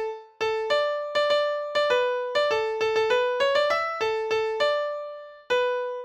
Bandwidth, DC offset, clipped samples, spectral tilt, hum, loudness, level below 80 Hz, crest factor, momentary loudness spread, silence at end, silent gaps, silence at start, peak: 8.6 kHz; under 0.1%; under 0.1%; -1.5 dB/octave; none; -25 LUFS; -64 dBFS; 14 dB; 6 LU; 0 s; none; 0 s; -12 dBFS